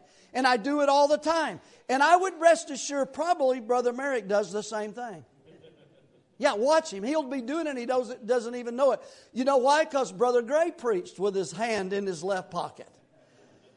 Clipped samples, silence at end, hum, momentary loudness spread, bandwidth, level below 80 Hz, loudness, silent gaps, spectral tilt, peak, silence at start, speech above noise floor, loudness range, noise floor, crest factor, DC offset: under 0.1%; 0.95 s; none; 12 LU; 11 kHz; -76 dBFS; -27 LUFS; none; -3.5 dB/octave; -8 dBFS; 0.35 s; 35 dB; 6 LU; -61 dBFS; 20 dB; under 0.1%